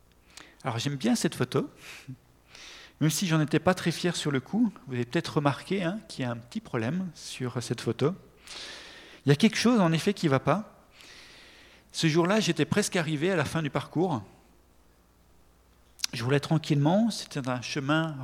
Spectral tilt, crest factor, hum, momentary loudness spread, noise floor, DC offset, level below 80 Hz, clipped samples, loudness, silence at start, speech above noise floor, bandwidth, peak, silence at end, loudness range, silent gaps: -5.5 dB/octave; 22 dB; none; 19 LU; -61 dBFS; under 0.1%; -62 dBFS; under 0.1%; -28 LUFS; 0.65 s; 33 dB; 16.5 kHz; -6 dBFS; 0 s; 5 LU; none